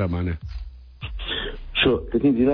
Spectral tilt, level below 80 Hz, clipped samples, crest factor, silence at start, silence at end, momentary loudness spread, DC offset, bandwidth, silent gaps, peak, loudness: -9 dB/octave; -36 dBFS; under 0.1%; 16 dB; 0 s; 0 s; 18 LU; under 0.1%; 5.4 kHz; none; -8 dBFS; -23 LUFS